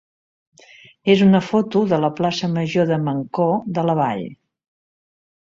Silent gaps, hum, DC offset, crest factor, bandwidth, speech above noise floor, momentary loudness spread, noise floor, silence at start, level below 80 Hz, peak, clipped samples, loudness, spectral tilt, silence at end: none; none; under 0.1%; 18 dB; 7.6 kHz; 30 dB; 8 LU; -48 dBFS; 1.05 s; -60 dBFS; -2 dBFS; under 0.1%; -19 LUFS; -7 dB/octave; 1.15 s